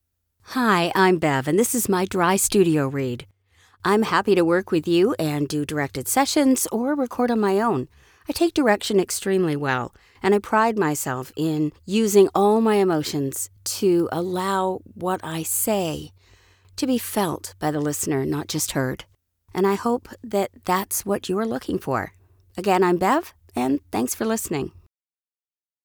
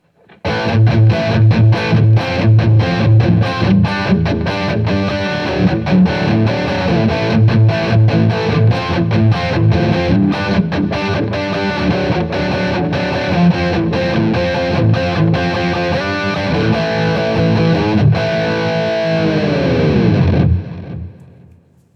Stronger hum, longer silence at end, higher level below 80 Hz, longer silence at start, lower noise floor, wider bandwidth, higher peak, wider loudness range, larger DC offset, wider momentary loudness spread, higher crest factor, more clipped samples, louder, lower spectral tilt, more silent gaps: neither; first, 1.05 s vs 0.85 s; second, -56 dBFS vs -36 dBFS; about the same, 0.5 s vs 0.45 s; first, under -90 dBFS vs -46 dBFS; first, over 20 kHz vs 6.8 kHz; second, -4 dBFS vs 0 dBFS; about the same, 5 LU vs 3 LU; neither; first, 10 LU vs 5 LU; about the same, 18 dB vs 14 dB; neither; second, -22 LUFS vs -14 LUFS; second, -4.5 dB/octave vs -8 dB/octave; neither